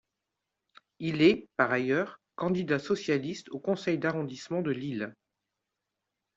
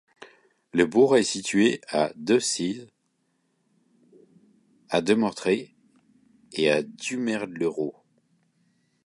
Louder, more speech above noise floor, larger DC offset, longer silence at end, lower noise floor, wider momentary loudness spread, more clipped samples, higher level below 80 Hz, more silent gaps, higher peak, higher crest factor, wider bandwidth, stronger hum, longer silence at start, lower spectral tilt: second, -30 LUFS vs -24 LUFS; first, 57 dB vs 49 dB; neither; about the same, 1.25 s vs 1.15 s; first, -86 dBFS vs -72 dBFS; about the same, 13 LU vs 11 LU; neither; about the same, -70 dBFS vs -68 dBFS; neither; second, -10 dBFS vs -6 dBFS; about the same, 22 dB vs 20 dB; second, 7.8 kHz vs 11.5 kHz; neither; first, 1 s vs 0.2 s; first, -6.5 dB/octave vs -4 dB/octave